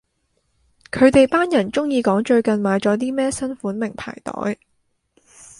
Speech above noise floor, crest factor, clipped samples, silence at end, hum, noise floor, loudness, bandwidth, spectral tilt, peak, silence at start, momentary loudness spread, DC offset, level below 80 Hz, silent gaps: 50 dB; 18 dB; under 0.1%; 1.05 s; none; -68 dBFS; -19 LUFS; 11.5 kHz; -5.5 dB/octave; -2 dBFS; 0.95 s; 13 LU; under 0.1%; -50 dBFS; none